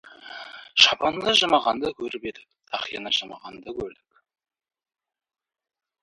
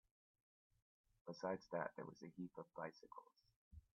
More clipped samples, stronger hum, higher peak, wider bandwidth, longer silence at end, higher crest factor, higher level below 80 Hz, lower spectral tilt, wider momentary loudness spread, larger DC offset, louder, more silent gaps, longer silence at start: neither; neither; first, 0 dBFS vs -30 dBFS; first, 11.5 kHz vs 7 kHz; first, 2.15 s vs 0.15 s; about the same, 26 dB vs 22 dB; first, -60 dBFS vs -78 dBFS; second, -1.5 dB/octave vs -5 dB/octave; first, 22 LU vs 16 LU; neither; first, -21 LUFS vs -51 LUFS; second, none vs 3.56-3.71 s; second, 0.05 s vs 1.25 s